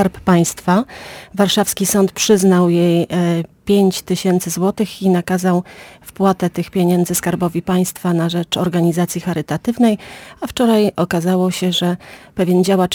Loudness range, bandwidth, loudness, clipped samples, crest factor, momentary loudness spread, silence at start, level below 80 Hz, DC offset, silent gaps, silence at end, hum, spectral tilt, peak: 3 LU; 19 kHz; -16 LUFS; under 0.1%; 14 dB; 8 LU; 0 s; -48 dBFS; under 0.1%; none; 0 s; none; -5.5 dB/octave; -2 dBFS